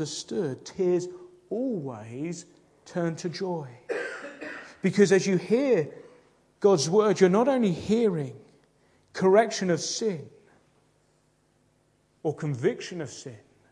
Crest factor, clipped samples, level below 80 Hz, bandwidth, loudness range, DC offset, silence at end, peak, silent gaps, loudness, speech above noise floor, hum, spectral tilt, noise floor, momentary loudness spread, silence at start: 22 dB; under 0.1%; -68 dBFS; 10.5 kHz; 10 LU; under 0.1%; 0.35 s; -6 dBFS; none; -26 LUFS; 41 dB; none; -5.5 dB/octave; -67 dBFS; 17 LU; 0 s